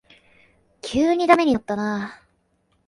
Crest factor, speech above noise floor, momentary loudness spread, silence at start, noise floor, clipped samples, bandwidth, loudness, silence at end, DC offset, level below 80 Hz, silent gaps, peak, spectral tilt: 22 dB; 47 dB; 16 LU; 0.85 s; -67 dBFS; under 0.1%; 11.5 kHz; -20 LUFS; 0.75 s; under 0.1%; -54 dBFS; none; -2 dBFS; -5.5 dB/octave